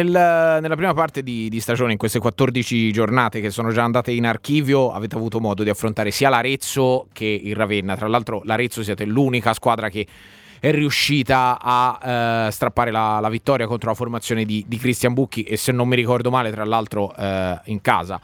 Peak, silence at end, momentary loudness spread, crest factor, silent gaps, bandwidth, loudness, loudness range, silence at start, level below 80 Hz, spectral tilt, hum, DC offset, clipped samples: 0 dBFS; 0.05 s; 7 LU; 20 dB; none; 19 kHz; -20 LUFS; 2 LU; 0 s; -52 dBFS; -5.5 dB/octave; none; under 0.1%; under 0.1%